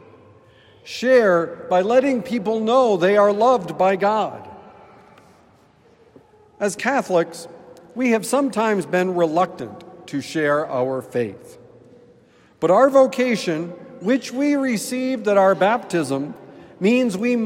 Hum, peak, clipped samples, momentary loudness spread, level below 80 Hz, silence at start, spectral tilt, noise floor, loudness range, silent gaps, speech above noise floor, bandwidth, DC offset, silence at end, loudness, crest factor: none; -2 dBFS; under 0.1%; 13 LU; -68 dBFS; 0.85 s; -5.5 dB/octave; -54 dBFS; 8 LU; none; 35 dB; 16 kHz; under 0.1%; 0 s; -19 LUFS; 18 dB